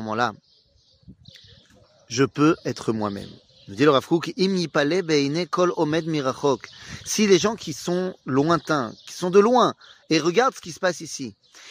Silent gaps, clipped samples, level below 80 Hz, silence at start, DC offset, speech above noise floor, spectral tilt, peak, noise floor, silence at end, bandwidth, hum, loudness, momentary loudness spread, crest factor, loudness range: none; under 0.1%; -62 dBFS; 0 s; under 0.1%; 38 dB; -5 dB/octave; -4 dBFS; -60 dBFS; 0 s; 15.5 kHz; none; -22 LUFS; 13 LU; 18 dB; 4 LU